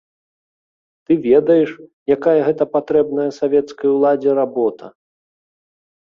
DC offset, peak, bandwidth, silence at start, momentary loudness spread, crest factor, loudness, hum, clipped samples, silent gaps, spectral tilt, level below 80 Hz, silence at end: under 0.1%; -2 dBFS; 6.8 kHz; 1.1 s; 7 LU; 16 dB; -16 LUFS; none; under 0.1%; 1.93-2.06 s; -8 dB/octave; -60 dBFS; 1.25 s